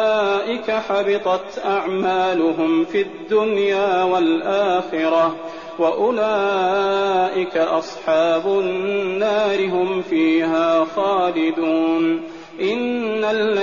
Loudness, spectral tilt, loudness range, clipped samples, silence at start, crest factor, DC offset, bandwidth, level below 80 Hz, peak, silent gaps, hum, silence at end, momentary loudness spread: -19 LUFS; -3 dB/octave; 1 LU; under 0.1%; 0 s; 12 dB; 0.3%; 7.2 kHz; -60 dBFS; -8 dBFS; none; none; 0 s; 4 LU